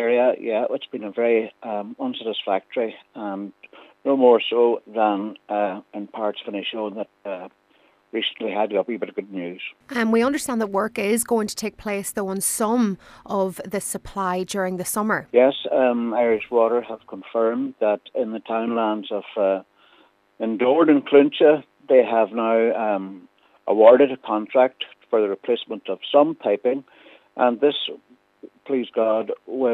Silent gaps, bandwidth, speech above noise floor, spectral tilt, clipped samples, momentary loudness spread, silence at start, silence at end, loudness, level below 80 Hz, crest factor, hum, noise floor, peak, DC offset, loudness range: none; 15.5 kHz; 38 dB; -4 dB/octave; under 0.1%; 14 LU; 0 s; 0 s; -22 LUFS; -62 dBFS; 22 dB; none; -60 dBFS; 0 dBFS; under 0.1%; 8 LU